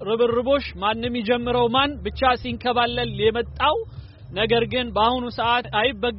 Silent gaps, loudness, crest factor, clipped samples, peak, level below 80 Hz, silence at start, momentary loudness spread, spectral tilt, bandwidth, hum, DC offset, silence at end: none; -22 LUFS; 16 dB; under 0.1%; -6 dBFS; -40 dBFS; 0 s; 5 LU; -2.5 dB/octave; 5.8 kHz; none; under 0.1%; 0 s